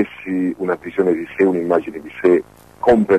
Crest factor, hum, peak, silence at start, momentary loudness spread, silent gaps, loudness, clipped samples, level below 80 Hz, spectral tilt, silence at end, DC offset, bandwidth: 14 dB; none; -4 dBFS; 0 s; 6 LU; none; -18 LUFS; under 0.1%; -48 dBFS; -8 dB/octave; 0 s; under 0.1%; 12.5 kHz